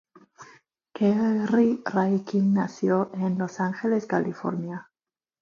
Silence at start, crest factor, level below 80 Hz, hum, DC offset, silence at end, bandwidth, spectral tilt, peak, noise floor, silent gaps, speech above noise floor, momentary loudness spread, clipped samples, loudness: 0.4 s; 18 dB; -70 dBFS; none; under 0.1%; 0.6 s; 7.2 kHz; -8 dB/octave; -8 dBFS; under -90 dBFS; none; over 66 dB; 9 LU; under 0.1%; -25 LUFS